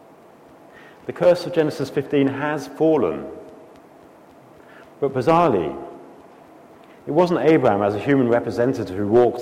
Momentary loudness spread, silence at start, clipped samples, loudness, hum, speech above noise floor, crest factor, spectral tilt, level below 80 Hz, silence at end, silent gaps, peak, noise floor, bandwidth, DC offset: 18 LU; 1.05 s; under 0.1%; -20 LUFS; none; 29 dB; 16 dB; -7.5 dB/octave; -58 dBFS; 0 s; none; -4 dBFS; -47 dBFS; 15 kHz; under 0.1%